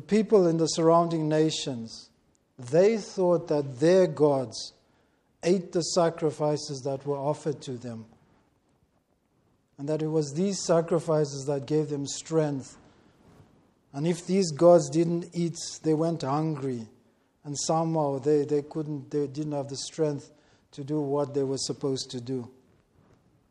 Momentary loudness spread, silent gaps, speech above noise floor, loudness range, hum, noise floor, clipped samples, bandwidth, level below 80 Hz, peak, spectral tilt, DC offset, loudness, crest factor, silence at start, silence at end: 15 LU; none; 44 dB; 7 LU; none; -70 dBFS; under 0.1%; 11.5 kHz; -70 dBFS; -8 dBFS; -6 dB/octave; under 0.1%; -27 LUFS; 20 dB; 0.1 s; 1 s